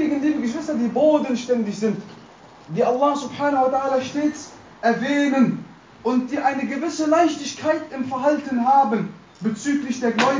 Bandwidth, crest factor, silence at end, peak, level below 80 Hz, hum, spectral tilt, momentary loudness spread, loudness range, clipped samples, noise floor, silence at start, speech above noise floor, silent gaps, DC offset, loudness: 7.6 kHz; 16 dB; 0 s; -4 dBFS; -62 dBFS; none; -5 dB/octave; 10 LU; 1 LU; under 0.1%; -45 dBFS; 0 s; 25 dB; none; under 0.1%; -21 LUFS